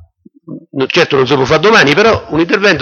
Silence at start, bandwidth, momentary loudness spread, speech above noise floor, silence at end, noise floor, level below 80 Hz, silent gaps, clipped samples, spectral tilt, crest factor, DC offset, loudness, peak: 0.5 s; 7.6 kHz; 7 LU; 29 dB; 0 s; -38 dBFS; -42 dBFS; none; under 0.1%; -4.5 dB/octave; 10 dB; under 0.1%; -10 LUFS; 0 dBFS